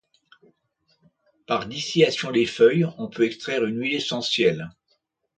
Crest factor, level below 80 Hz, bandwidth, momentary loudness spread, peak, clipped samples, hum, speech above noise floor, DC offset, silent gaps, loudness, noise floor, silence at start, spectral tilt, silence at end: 20 dB; -64 dBFS; 9.2 kHz; 9 LU; -4 dBFS; under 0.1%; none; 49 dB; under 0.1%; none; -23 LUFS; -71 dBFS; 1.5 s; -5 dB/octave; 0.7 s